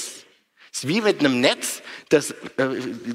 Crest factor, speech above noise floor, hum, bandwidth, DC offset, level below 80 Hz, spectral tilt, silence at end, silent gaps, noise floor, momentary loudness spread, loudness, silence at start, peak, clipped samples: 20 dB; 33 dB; none; 16 kHz; under 0.1%; -66 dBFS; -3.5 dB/octave; 0 s; none; -55 dBFS; 15 LU; -22 LUFS; 0 s; -4 dBFS; under 0.1%